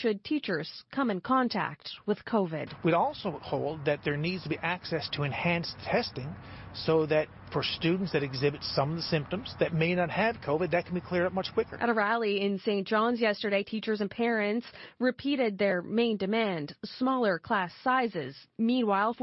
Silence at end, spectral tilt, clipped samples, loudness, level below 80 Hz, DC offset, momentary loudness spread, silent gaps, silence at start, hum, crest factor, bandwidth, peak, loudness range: 0 s; -8.5 dB/octave; under 0.1%; -30 LUFS; -62 dBFS; under 0.1%; 7 LU; none; 0 s; none; 16 dB; 6 kHz; -14 dBFS; 2 LU